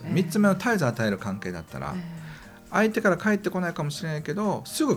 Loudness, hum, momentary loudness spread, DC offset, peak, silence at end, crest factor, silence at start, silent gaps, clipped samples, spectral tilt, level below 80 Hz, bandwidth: -26 LUFS; none; 13 LU; under 0.1%; -8 dBFS; 0 s; 16 dB; 0 s; none; under 0.1%; -6 dB/octave; -58 dBFS; 16 kHz